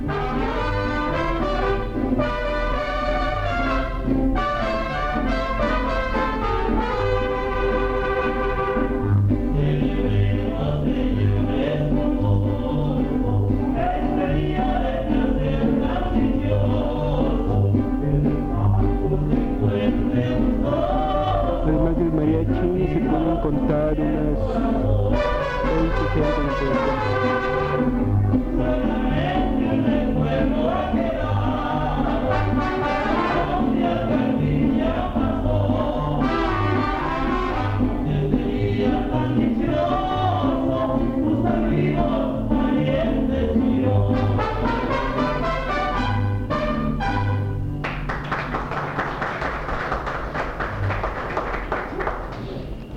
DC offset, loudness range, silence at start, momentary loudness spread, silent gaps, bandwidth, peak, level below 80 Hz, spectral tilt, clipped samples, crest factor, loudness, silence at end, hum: under 0.1%; 2 LU; 0 s; 4 LU; none; 7.4 kHz; -6 dBFS; -28 dBFS; -8.5 dB/octave; under 0.1%; 16 dB; -22 LUFS; 0 s; none